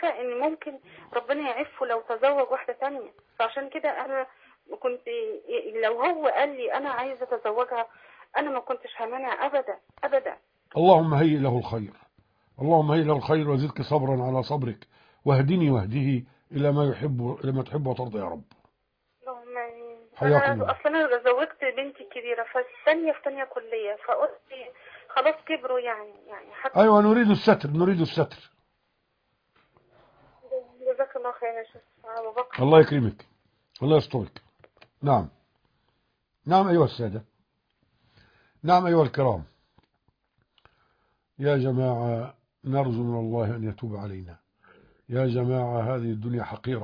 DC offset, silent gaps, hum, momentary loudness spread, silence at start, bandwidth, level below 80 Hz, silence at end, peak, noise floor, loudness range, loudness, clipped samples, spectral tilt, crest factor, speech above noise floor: under 0.1%; none; none; 16 LU; 0 s; 5.2 kHz; -62 dBFS; 0 s; -4 dBFS; -75 dBFS; 7 LU; -25 LUFS; under 0.1%; -9 dB/octave; 22 dB; 50 dB